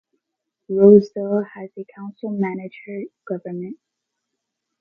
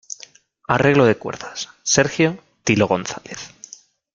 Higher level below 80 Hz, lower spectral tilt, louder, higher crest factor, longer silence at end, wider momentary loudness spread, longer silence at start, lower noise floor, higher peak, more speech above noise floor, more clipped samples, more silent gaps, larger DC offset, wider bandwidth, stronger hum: second, -64 dBFS vs -54 dBFS; first, -10 dB/octave vs -4 dB/octave; about the same, -18 LUFS vs -19 LUFS; about the same, 20 dB vs 20 dB; first, 1.05 s vs 0.65 s; first, 23 LU vs 20 LU; about the same, 0.7 s vs 0.7 s; first, -80 dBFS vs -47 dBFS; about the same, 0 dBFS vs -2 dBFS; first, 61 dB vs 28 dB; neither; neither; neither; second, 6 kHz vs 10 kHz; neither